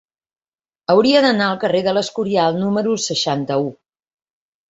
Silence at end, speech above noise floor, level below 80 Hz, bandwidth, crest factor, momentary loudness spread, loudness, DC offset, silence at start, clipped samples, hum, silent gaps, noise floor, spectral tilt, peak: 1 s; over 73 dB; -60 dBFS; 8 kHz; 18 dB; 8 LU; -17 LUFS; under 0.1%; 0.9 s; under 0.1%; none; none; under -90 dBFS; -4.5 dB/octave; -2 dBFS